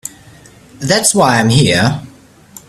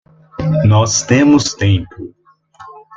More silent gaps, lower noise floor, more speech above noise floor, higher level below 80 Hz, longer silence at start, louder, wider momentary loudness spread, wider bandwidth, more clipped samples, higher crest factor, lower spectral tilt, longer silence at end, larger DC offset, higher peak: neither; about the same, -41 dBFS vs -42 dBFS; about the same, 30 dB vs 30 dB; about the same, -44 dBFS vs -44 dBFS; second, 0.05 s vs 0.4 s; about the same, -11 LUFS vs -13 LUFS; second, 15 LU vs 23 LU; first, 14.5 kHz vs 9 kHz; neither; about the same, 14 dB vs 14 dB; about the same, -4 dB/octave vs -5 dB/octave; first, 0.6 s vs 0.2 s; neither; about the same, 0 dBFS vs 0 dBFS